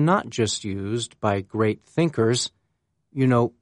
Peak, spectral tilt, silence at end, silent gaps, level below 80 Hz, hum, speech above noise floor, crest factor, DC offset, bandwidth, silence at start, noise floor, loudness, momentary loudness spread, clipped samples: -6 dBFS; -5.5 dB/octave; 0.15 s; none; -60 dBFS; none; 51 dB; 18 dB; under 0.1%; 11 kHz; 0 s; -74 dBFS; -24 LUFS; 7 LU; under 0.1%